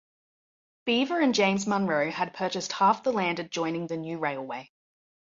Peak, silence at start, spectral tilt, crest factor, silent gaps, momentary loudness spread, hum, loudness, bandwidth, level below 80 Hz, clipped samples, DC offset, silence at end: -8 dBFS; 0.85 s; -4.5 dB/octave; 20 dB; none; 10 LU; none; -27 LUFS; 7.8 kHz; -72 dBFS; under 0.1%; under 0.1%; 0.65 s